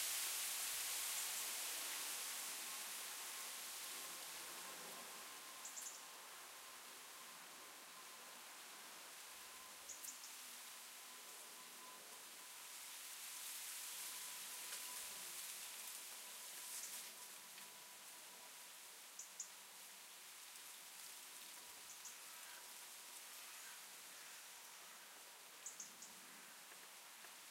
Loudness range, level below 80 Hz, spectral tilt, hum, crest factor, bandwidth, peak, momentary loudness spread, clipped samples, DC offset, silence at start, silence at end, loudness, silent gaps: 9 LU; under -90 dBFS; 2 dB/octave; none; 22 dB; 16 kHz; -30 dBFS; 12 LU; under 0.1%; under 0.1%; 0 s; 0 s; -50 LUFS; none